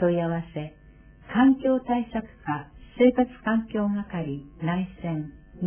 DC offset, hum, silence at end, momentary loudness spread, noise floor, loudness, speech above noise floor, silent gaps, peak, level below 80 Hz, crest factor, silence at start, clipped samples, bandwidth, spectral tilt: under 0.1%; none; 0 s; 14 LU; -49 dBFS; -26 LUFS; 25 dB; none; -8 dBFS; -52 dBFS; 18 dB; 0 s; under 0.1%; 3.4 kHz; -11.5 dB/octave